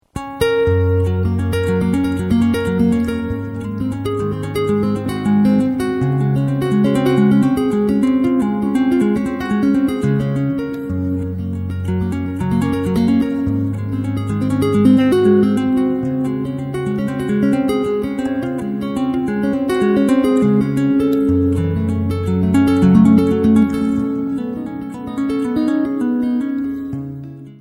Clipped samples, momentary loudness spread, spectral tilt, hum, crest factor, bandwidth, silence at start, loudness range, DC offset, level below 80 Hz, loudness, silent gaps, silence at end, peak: under 0.1%; 9 LU; -8 dB/octave; none; 16 dB; 16.5 kHz; 0.15 s; 5 LU; under 0.1%; -40 dBFS; -17 LUFS; none; 0.05 s; 0 dBFS